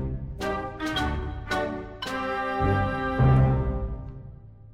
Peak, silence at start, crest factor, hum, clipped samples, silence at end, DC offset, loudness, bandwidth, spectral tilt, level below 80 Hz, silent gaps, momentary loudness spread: -10 dBFS; 0 s; 18 dB; none; under 0.1%; 0 s; under 0.1%; -27 LUFS; 11.5 kHz; -7 dB/octave; -34 dBFS; none; 14 LU